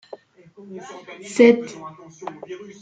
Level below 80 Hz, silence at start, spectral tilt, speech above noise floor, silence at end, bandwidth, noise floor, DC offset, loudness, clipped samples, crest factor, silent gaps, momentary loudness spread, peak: -68 dBFS; 0.7 s; -5 dB/octave; 22 dB; 0.25 s; 9.2 kHz; -44 dBFS; under 0.1%; -17 LUFS; under 0.1%; 22 dB; none; 24 LU; -2 dBFS